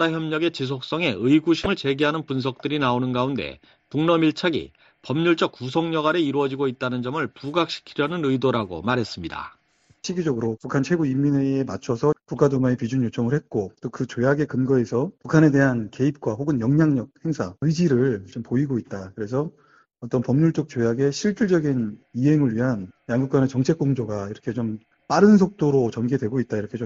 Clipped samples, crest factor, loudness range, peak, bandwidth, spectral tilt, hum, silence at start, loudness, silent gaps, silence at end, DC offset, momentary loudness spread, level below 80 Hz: under 0.1%; 20 dB; 4 LU; -2 dBFS; 7.8 kHz; -7 dB/octave; none; 0 s; -23 LUFS; none; 0 s; under 0.1%; 10 LU; -56 dBFS